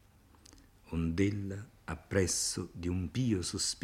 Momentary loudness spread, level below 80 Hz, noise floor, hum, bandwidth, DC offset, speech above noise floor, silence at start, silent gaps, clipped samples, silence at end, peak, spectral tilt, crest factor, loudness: 12 LU; -56 dBFS; -60 dBFS; none; 16 kHz; under 0.1%; 27 dB; 0.55 s; none; under 0.1%; 0.05 s; -16 dBFS; -4.5 dB/octave; 20 dB; -34 LUFS